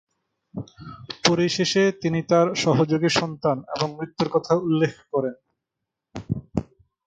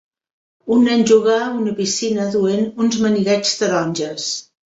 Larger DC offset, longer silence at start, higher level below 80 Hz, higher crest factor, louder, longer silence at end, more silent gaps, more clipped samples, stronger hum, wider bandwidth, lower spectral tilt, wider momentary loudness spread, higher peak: neither; about the same, 0.55 s vs 0.65 s; first, -54 dBFS vs -60 dBFS; about the same, 20 dB vs 16 dB; second, -23 LUFS vs -17 LUFS; first, 0.45 s vs 0.3 s; neither; neither; neither; first, 9.2 kHz vs 8 kHz; about the same, -5 dB/octave vs -4 dB/octave; first, 18 LU vs 9 LU; about the same, -4 dBFS vs -2 dBFS